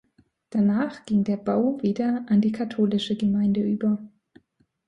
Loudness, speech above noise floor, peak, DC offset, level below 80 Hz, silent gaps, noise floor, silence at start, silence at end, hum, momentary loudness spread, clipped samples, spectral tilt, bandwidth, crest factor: -24 LUFS; 43 dB; -12 dBFS; under 0.1%; -60 dBFS; none; -66 dBFS; 0.55 s; 0.8 s; none; 4 LU; under 0.1%; -8 dB/octave; 7.6 kHz; 14 dB